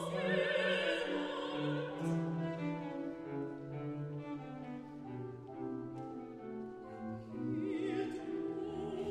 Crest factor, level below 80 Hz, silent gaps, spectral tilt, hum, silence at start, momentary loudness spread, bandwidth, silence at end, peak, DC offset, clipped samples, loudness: 18 dB; -72 dBFS; none; -6.5 dB/octave; none; 0 s; 13 LU; 12 kHz; 0 s; -22 dBFS; under 0.1%; under 0.1%; -40 LUFS